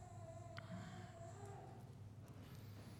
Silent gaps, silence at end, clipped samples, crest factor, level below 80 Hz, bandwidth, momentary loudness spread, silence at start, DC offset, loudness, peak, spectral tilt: none; 0 s; under 0.1%; 18 dB; -70 dBFS; 19 kHz; 5 LU; 0 s; under 0.1%; -56 LUFS; -36 dBFS; -6 dB/octave